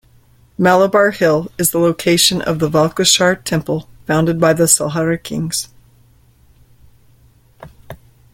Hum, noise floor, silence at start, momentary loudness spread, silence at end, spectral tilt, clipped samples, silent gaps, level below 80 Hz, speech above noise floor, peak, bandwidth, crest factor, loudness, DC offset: none; -50 dBFS; 0.6 s; 10 LU; 0.4 s; -3.5 dB/octave; under 0.1%; none; -48 dBFS; 35 dB; 0 dBFS; 17 kHz; 16 dB; -14 LUFS; under 0.1%